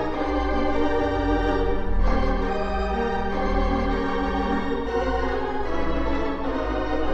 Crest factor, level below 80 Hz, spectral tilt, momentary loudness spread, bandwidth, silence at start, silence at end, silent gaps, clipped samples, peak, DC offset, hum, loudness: 14 dB; -28 dBFS; -7.5 dB/octave; 3 LU; 6.6 kHz; 0 s; 0 s; none; under 0.1%; -8 dBFS; under 0.1%; none; -25 LUFS